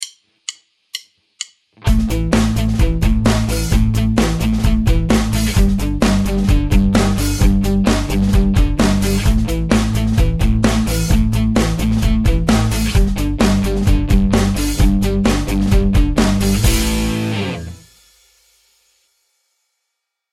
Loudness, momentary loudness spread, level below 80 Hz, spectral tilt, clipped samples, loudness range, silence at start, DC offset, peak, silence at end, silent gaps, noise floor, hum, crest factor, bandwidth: -16 LUFS; 7 LU; -18 dBFS; -5.5 dB/octave; under 0.1%; 4 LU; 0 s; under 0.1%; 0 dBFS; 2.55 s; none; -76 dBFS; none; 14 dB; 16 kHz